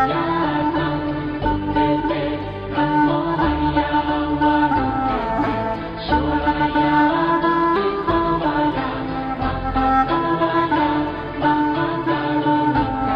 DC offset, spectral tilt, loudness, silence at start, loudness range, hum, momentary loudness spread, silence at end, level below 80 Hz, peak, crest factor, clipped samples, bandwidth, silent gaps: under 0.1%; -8.5 dB/octave; -19 LUFS; 0 s; 1 LU; none; 6 LU; 0 s; -36 dBFS; -4 dBFS; 14 dB; under 0.1%; 5.4 kHz; none